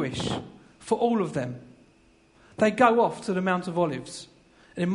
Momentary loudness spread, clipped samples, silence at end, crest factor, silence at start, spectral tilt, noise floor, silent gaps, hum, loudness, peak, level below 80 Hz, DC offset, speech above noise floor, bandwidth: 23 LU; under 0.1%; 0 s; 22 dB; 0 s; -6 dB/octave; -59 dBFS; none; none; -26 LUFS; -6 dBFS; -60 dBFS; under 0.1%; 34 dB; 11 kHz